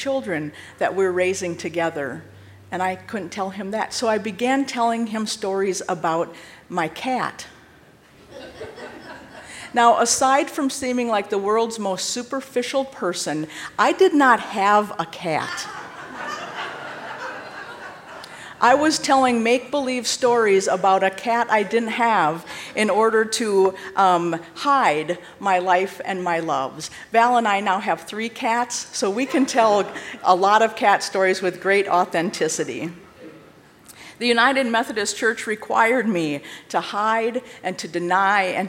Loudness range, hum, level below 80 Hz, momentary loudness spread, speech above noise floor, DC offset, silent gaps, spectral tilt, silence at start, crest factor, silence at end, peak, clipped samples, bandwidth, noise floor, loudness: 6 LU; none; -64 dBFS; 15 LU; 30 dB; under 0.1%; none; -3.5 dB/octave; 0 s; 20 dB; 0 s; -2 dBFS; under 0.1%; 16 kHz; -50 dBFS; -21 LUFS